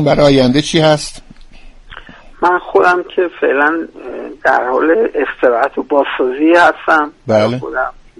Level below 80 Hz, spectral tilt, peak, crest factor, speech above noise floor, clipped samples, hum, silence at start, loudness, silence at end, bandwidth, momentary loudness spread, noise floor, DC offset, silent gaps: -38 dBFS; -5.5 dB/octave; 0 dBFS; 14 dB; 23 dB; under 0.1%; none; 0 s; -13 LUFS; 0.3 s; 11.5 kHz; 9 LU; -35 dBFS; under 0.1%; none